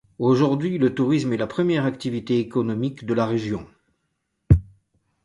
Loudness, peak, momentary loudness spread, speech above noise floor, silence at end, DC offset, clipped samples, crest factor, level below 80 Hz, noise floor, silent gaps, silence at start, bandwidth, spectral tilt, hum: -22 LUFS; -2 dBFS; 7 LU; 53 dB; 0.6 s; under 0.1%; under 0.1%; 22 dB; -36 dBFS; -75 dBFS; none; 0.2 s; 11.5 kHz; -8 dB/octave; none